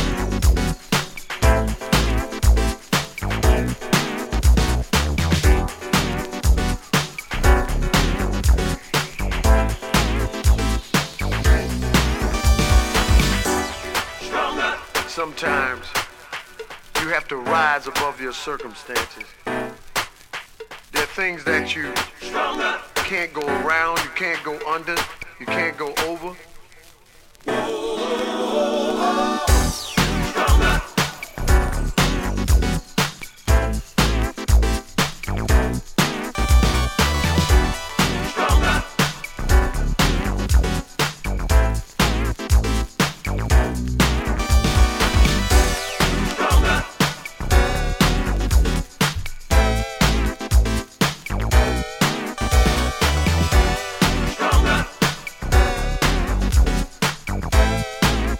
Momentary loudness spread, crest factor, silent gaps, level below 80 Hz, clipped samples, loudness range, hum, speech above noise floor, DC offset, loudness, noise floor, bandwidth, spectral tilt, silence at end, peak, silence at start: 8 LU; 18 dB; none; -22 dBFS; under 0.1%; 5 LU; none; 24 dB; under 0.1%; -21 LUFS; -48 dBFS; 17 kHz; -4.5 dB/octave; 0 s; 0 dBFS; 0 s